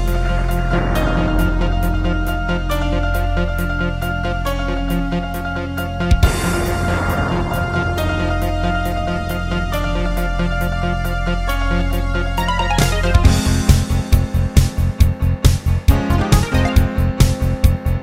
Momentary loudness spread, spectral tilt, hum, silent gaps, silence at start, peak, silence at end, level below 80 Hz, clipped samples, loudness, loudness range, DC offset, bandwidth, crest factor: 6 LU; -6 dB/octave; none; none; 0 s; 0 dBFS; 0 s; -20 dBFS; under 0.1%; -18 LUFS; 4 LU; under 0.1%; 16.5 kHz; 16 dB